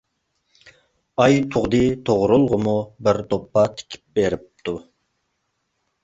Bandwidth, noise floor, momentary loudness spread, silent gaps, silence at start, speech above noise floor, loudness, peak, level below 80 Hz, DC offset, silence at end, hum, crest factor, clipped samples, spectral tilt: 8 kHz; -73 dBFS; 13 LU; none; 1.2 s; 54 dB; -20 LUFS; -2 dBFS; -48 dBFS; under 0.1%; 1.25 s; none; 18 dB; under 0.1%; -6.5 dB/octave